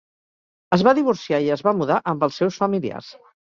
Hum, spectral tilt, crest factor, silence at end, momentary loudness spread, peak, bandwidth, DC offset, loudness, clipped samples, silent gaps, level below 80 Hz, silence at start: none; -6.5 dB/octave; 20 dB; 0.45 s; 7 LU; -2 dBFS; 7.4 kHz; under 0.1%; -20 LUFS; under 0.1%; none; -62 dBFS; 0.7 s